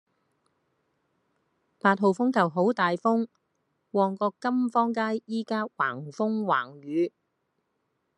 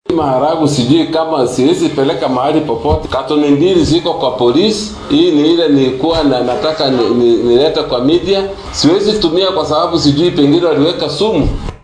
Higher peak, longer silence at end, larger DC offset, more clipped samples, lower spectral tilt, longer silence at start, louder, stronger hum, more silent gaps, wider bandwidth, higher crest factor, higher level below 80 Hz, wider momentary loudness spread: second, -6 dBFS vs 0 dBFS; first, 1.1 s vs 0.1 s; neither; neither; first, -7 dB/octave vs -5.5 dB/octave; first, 1.85 s vs 0.1 s; second, -27 LUFS vs -12 LUFS; neither; neither; about the same, 10.5 kHz vs 11 kHz; first, 22 dB vs 12 dB; second, -82 dBFS vs -32 dBFS; about the same, 7 LU vs 5 LU